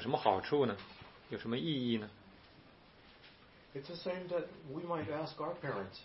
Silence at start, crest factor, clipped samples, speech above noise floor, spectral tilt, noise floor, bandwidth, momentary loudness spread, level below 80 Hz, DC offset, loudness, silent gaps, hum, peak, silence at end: 0 s; 26 dB; under 0.1%; 23 dB; -4.5 dB/octave; -61 dBFS; 5.8 kHz; 25 LU; -70 dBFS; under 0.1%; -38 LUFS; none; none; -14 dBFS; 0 s